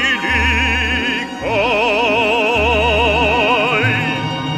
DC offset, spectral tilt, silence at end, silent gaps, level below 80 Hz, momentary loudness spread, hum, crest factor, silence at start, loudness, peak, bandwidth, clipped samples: under 0.1%; -4.5 dB/octave; 0 s; none; -30 dBFS; 5 LU; none; 12 dB; 0 s; -14 LUFS; -2 dBFS; 14 kHz; under 0.1%